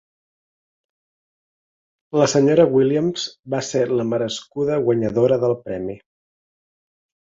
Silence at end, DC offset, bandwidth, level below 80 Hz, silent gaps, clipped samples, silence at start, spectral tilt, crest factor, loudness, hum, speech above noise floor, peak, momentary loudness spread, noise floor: 1.4 s; under 0.1%; 7.8 kHz; -58 dBFS; 3.39-3.43 s; under 0.1%; 2.15 s; -5.5 dB/octave; 18 dB; -19 LUFS; none; over 71 dB; -2 dBFS; 13 LU; under -90 dBFS